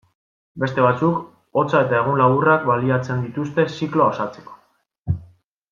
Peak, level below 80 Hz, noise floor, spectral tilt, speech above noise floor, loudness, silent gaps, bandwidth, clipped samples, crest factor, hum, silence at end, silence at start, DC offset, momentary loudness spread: -2 dBFS; -52 dBFS; -61 dBFS; -8 dB/octave; 42 dB; -20 LUFS; 4.99-5.03 s; 7.2 kHz; under 0.1%; 18 dB; none; 0.45 s; 0.55 s; under 0.1%; 11 LU